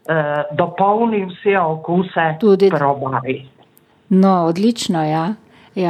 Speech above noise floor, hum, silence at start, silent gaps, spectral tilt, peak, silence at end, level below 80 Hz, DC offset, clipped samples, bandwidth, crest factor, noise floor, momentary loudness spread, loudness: 36 dB; none; 0.1 s; none; -6.5 dB/octave; -2 dBFS; 0 s; -64 dBFS; under 0.1%; under 0.1%; 12.5 kHz; 14 dB; -52 dBFS; 9 LU; -17 LUFS